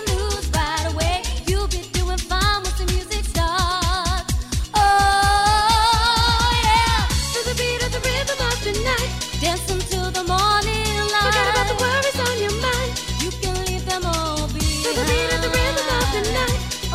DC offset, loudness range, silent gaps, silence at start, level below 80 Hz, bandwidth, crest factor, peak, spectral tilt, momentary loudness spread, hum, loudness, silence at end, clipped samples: under 0.1%; 5 LU; none; 0 s; -26 dBFS; 16 kHz; 14 dB; -6 dBFS; -3 dB/octave; 8 LU; none; -20 LUFS; 0 s; under 0.1%